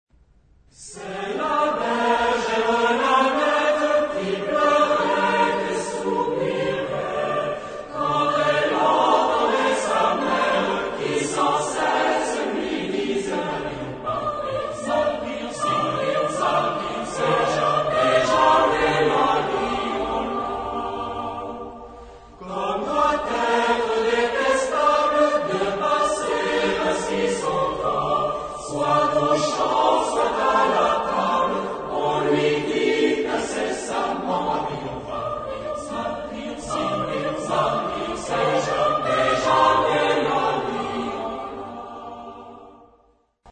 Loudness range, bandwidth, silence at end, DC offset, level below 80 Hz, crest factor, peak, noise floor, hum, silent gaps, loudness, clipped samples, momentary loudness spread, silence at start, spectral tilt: 6 LU; 9.4 kHz; 0 s; under 0.1%; -50 dBFS; 18 dB; -4 dBFS; -61 dBFS; none; none; -22 LUFS; under 0.1%; 11 LU; 0.8 s; -4 dB/octave